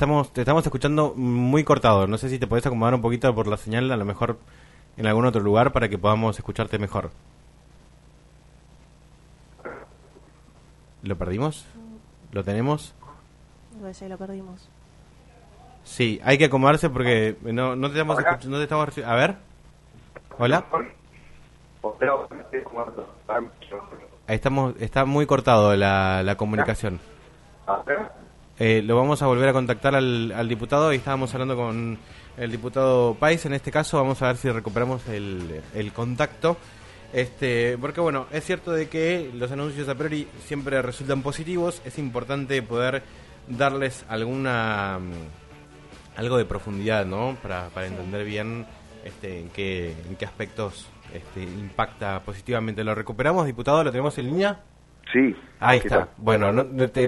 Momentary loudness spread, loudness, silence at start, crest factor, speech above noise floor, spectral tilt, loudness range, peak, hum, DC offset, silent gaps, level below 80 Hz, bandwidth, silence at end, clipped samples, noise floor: 17 LU; -24 LUFS; 0 s; 24 dB; 29 dB; -6.5 dB/octave; 11 LU; 0 dBFS; none; under 0.1%; none; -46 dBFS; 11.5 kHz; 0 s; under 0.1%; -52 dBFS